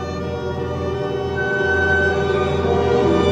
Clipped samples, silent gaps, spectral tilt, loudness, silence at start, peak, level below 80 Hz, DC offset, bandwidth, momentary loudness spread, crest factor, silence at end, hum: under 0.1%; none; -6.5 dB/octave; -19 LUFS; 0 s; -4 dBFS; -36 dBFS; under 0.1%; 8.8 kHz; 8 LU; 14 dB; 0 s; none